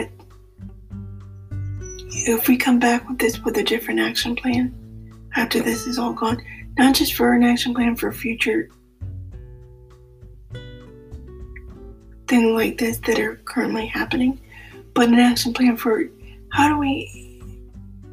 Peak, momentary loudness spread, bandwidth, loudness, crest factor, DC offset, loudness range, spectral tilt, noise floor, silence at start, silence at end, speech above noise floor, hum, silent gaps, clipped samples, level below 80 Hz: -4 dBFS; 24 LU; 16 kHz; -20 LUFS; 18 dB; under 0.1%; 8 LU; -4 dB/octave; -46 dBFS; 0 s; 0 s; 27 dB; none; none; under 0.1%; -42 dBFS